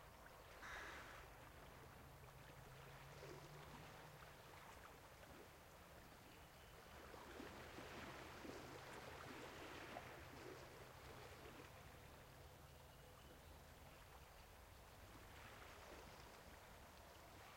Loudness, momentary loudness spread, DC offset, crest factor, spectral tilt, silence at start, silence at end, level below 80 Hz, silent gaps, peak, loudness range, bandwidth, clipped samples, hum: -60 LUFS; 7 LU; under 0.1%; 20 dB; -4 dB/octave; 0 s; 0 s; -70 dBFS; none; -40 dBFS; 6 LU; 16.5 kHz; under 0.1%; none